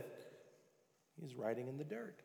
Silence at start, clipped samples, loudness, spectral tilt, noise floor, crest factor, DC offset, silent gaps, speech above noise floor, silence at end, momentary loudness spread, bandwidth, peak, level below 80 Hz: 0 s; under 0.1%; -46 LUFS; -7 dB/octave; -76 dBFS; 20 dB; under 0.1%; none; 31 dB; 0 s; 20 LU; over 20 kHz; -28 dBFS; under -90 dBFS